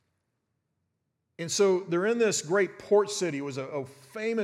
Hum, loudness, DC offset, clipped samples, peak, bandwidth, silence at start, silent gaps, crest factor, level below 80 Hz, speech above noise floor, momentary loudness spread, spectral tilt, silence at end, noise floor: none; -27 LUFS; under 0.1%; under 0.1%; -12 dBFS; 14.5 kHz; 1.4 s; none; 18 dB; -80 dBFS; 52 dB; 12 LU; -4 dB/octave; 0 s; -80 dBFS